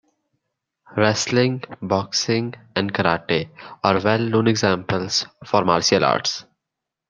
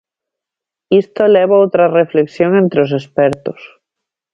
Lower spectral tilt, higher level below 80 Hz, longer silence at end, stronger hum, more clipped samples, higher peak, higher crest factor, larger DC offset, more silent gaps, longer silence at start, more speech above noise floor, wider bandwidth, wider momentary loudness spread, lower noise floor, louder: second, -4.5 dB/octave vs -8 dB/octave; about the same, -60 dBFS vs -56 dBFS; about the same, 0.7 s vs 0.65 s; neither; neither; about the same, -2 dBFS vs 0 dBFS; first, 20 dB vs 14 dB; neither; neither; about the same, 0.9 s vs 0.9 s; second, 63 dB vs 73 dB; first, 10.5 kHz vs 7.4 kHz; about the same, 8 LU vs 6 LU; about the same, -83 dBFS vs -85 dBFS; second, -20 LUFS vs -12 LUFS